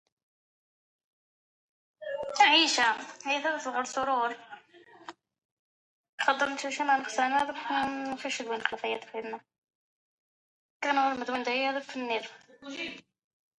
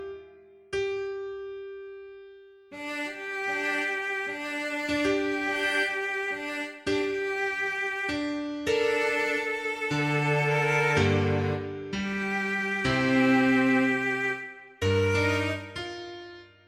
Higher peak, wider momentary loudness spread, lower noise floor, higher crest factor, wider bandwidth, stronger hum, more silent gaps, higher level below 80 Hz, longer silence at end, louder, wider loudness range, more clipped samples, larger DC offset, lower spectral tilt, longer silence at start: first, -8 dBFS vs -12 dBFS; first, 20 LU vs 15 LU; first, -56 dBFS vs -52 dBFS; first, 24 dB vs 16 dB; second, 11.5 kHz vs 16 kHz; neither; first, 5.45-6.18 s, 9.58-9.62 s, 9.75-10.80 s vs none; second, -74 dBFS vs -58 dBFS; first, 0.6 s vs 0.2 s; about the same, -29 LUFS vs -27 LUFS; about the same, 7 LU vs 7 LU; neither; neither; second, -1 dB/octave vs -5.5 dB/octave; first, 2 s vs 0 s